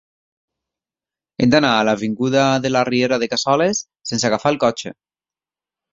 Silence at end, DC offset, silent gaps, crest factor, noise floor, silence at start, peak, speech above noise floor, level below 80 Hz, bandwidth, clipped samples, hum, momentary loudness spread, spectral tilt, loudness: 1 s; under 0.1%; none; 18 dB; under -90 dBFS; 1.4 s; -2 dBFS; over 73 dB; -56 dBFS; 7.8 kHz; under 0.1%; none; 10 LU; -4.5 dB/octave; -17 LUFS